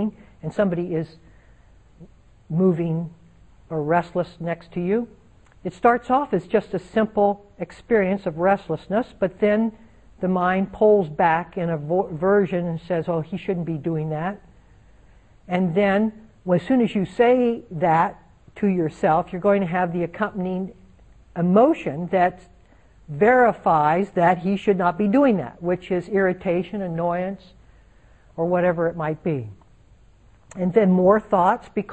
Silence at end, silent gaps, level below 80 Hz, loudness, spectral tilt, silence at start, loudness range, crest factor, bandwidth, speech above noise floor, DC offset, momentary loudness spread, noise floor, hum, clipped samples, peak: 0 s; none; -52 dBFS; -22 LUFS; -8.5 dB/octave; 0 s; 6 LU; 18 dB; 8.6 kHz; 32 dB; under 0.1%; 11 LU; -53 dBFS; none; under 0.1%; -4 dBFS